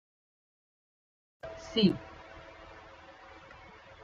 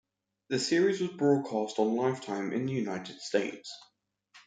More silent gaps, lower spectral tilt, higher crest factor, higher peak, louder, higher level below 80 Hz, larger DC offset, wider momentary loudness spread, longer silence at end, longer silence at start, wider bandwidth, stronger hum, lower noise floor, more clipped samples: neither; first, -6.5 dB/octave vs -5 dB/octave; first, 24 dB vs 18 dB; about the same, -12 dBFS vs -12 dBFS; about the same, -30 LUFS vs -30 LUFS; first, -62 dBFS vs -78 dBFS; neither; first, 24 LU vs 11 LU; about the same, 0 s vs 0.1 s; first, 1.45 s vs 0.5 s; second, 7.6 kHz vs 9.6 kHz; neither; second, -53 dBFS vs -63 dBFS; neither